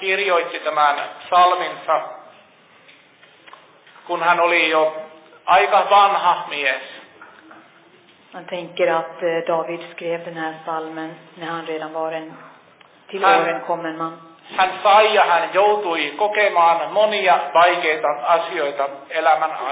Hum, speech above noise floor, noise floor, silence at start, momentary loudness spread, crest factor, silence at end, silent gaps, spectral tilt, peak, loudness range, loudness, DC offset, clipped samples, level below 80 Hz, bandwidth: none; 32 dB; -51 dBFS; 0 s; 15 LU; 16 dB; 0 s; none; -7 dB/octave; -4 dBFS; 9 LU; -18 LUFS; under 0.1%; under 0.1%; -72 dBFS; 4 kHz